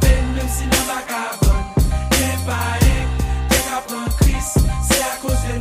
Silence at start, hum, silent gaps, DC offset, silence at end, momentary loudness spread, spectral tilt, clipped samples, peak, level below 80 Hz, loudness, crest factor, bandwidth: 0 s; none; none; under 0.1%; 0 s; 5 LU; -4.5 dB/octave; under 0.1%; 0 dBFS; -20 dBFS; -19 LUFS; 16 dB; 16 kHz